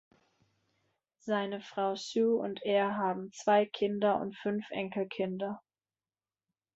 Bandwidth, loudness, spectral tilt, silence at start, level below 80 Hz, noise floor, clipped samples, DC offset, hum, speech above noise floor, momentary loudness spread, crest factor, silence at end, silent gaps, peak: 8 kHz; -32 LUFS; -5.5 dB/octave; 1.25 s; -78 dBFS; under -90 dBFS; under 0.1%; under 0.1%; none; over 58 dB; 9 LU; 18 dB; 1.15 s; none; -14 dBFS